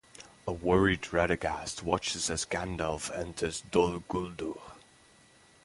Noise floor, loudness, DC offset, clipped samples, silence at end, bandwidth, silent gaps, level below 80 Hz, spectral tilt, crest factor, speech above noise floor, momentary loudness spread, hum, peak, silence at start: -60 dBFS; -31 LUFS; under 0.1%; under 0.1%; 0.85 s; 11.5 kHz; none; -50 dBFS; -4 dB/octave; 22 dB; 29 dB; 13 LU; none; -10 dBFS; 0.2 s